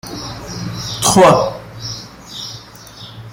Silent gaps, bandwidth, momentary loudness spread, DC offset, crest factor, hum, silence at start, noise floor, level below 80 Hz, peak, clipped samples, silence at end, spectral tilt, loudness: none; 16.5 kHz; 24 LU; under 0.1%; 16 dB; none; 0.05 s; -36 dBFS; -44 dBFS; 0 dBFS; under 0.1%; 0 s; -4 dB/octave; -15 LUFS